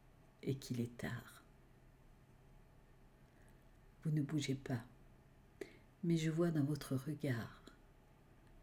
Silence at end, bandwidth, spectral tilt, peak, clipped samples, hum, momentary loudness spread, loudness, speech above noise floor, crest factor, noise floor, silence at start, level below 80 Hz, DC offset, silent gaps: 0 s; 17 kHz; -6.5 dB/octave; -26 dBFS; under 0.1%; none; 19 LU; -41 LUFS; 26 dB; 18 dB; -66 dBFS; 0.45 s; -68 dBFS; under 0.1%; none